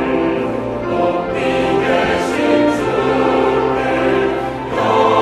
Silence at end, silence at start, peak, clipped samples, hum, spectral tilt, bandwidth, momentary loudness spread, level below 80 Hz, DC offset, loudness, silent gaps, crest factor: 0 s; 0 s; -2 dBFS; under 0.1%; none; -6 dB/octave; 13.5 kHz; 6 LU; -40 dBFS; under 0.1%; -16 LUFS; none; 14 dB